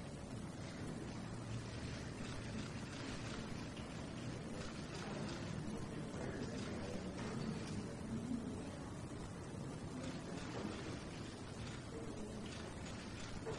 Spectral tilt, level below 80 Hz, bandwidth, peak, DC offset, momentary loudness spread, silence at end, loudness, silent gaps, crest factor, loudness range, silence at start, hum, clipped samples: -5.5 dB/octave; -60 dBFS; 11.5 kHz; -32 dBFS; under 0.1%; 4 LU; 0 s; -47 LUFS; none; 16 dB; 2 LU; 0 s; none; under 0.1%